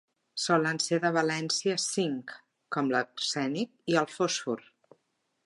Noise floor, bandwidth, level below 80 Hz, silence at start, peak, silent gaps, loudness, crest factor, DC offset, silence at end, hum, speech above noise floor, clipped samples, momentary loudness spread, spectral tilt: -77 dBFS; 11.5 kHz; -84 dBFS; 0.35 s; -10 dBFS; none; -29 LUFS; 20 dB; under 0.1%; 0.85 s; none; 48 dB; under 0.1%; 10 LU; -3.5 dB/octave